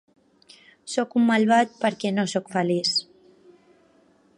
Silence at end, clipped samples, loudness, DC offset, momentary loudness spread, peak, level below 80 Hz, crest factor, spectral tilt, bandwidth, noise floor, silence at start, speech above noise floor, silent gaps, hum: 1.35 s; under 0.1%; -23 LUFS; under 0.1%; 8 LU; -6 dBFS; -74 dBFS; 18 dB; -4.5 dB/octave; 11 kHz; -59 dBFS; 0.85 s; 37 dB; none; none